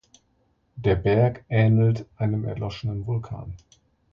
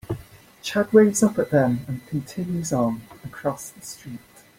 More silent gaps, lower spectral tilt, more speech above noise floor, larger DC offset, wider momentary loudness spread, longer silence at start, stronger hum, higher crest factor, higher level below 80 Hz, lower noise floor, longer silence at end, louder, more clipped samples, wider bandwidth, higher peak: neither; first, -9 dB/octave vs -5.5 dB/octave; first, 44 dB vs 23 dB; neither; second, 17 LU vs 21 LU; first, 0.75 s vs 0.1 s; neither; about the same, 16 dB vs 20 dB; first, -44 dBFS vs -56 dBFS; first, -67 dBFS vs -45 dBFS; first, 0.55 s vs 0.4 s; about the same, -24 LUFS vs -22 LUFS; neither; second, 6.6 kHz vs 16.5 kHz; second, -8 dBFS vs -4 dBFS